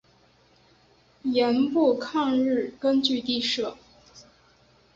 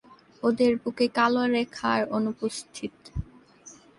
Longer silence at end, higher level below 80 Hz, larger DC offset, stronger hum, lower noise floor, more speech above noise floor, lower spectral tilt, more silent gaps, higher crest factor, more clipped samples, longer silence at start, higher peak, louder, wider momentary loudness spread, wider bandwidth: first, 0.75 s vs 0.25 s; second, -66 dBFS vs -48 dBFS; neither; neither; first, -60 dBFS vs -51 dBFS; first, 36 dB vs 26 dB; about the same, -4 dB/octave vs -5 dB/octave; neither; about the same, 16 dB vs 18 dB; neither; first, 1.25 s vs 0.1 s; about the same, -10 dBFS vs -10 dBFS; about the same, -24 LUFS vs -26 LUFS; second, 6 LU vs 15 LU; second, 7.8 kHz vs 11.5 kHz